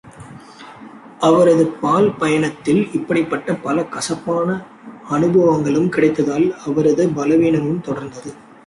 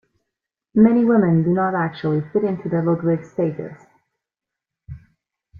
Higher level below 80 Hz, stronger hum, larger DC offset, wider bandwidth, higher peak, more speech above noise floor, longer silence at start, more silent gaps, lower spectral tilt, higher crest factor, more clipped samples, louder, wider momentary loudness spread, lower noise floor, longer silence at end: about the same, -54 dBFS vs -56 dBFS; neither; neither; first, 11.5 kHz vs 4.9 kHz; about the same, -2 dBFS vs -2 dBFS; second, 22 dB vs 68 dB; second, 0.05 s vs 0.75 s; neither; second, -6.5 dB/octave vs -10.5 dB/octave; about the same, 14 dB vs 18 dB; neither; about the same, -17 LUFS vs -19 LUFS; first, 13 LU vs 9 LU; second, -39 dBFS vs -86 dBFS; second, 0.35 s vs 0.65 s